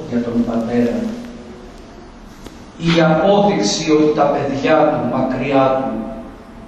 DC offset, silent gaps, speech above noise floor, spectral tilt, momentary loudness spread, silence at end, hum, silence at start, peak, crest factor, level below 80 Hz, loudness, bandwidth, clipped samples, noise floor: under 0.1%; none; 22 dB; -5.5 dB/octave; 22 LU; 0 s; none; 0 s; 0 dBFS; 16 dB; -42 dBFS; -16 LUFS; 8.8 kHz; under 0.1%; -37 dBFS